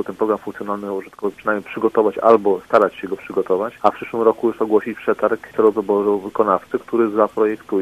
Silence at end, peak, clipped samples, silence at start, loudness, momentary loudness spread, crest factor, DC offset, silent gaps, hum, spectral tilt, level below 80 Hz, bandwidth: 0 s; 0 dBFS; under 0.1%; 0 s; -19 LUFS; 9 LU; 18 dB; under 0.1%; none; none; -7 dB/octave; -60 dBFS; 13.5 kHz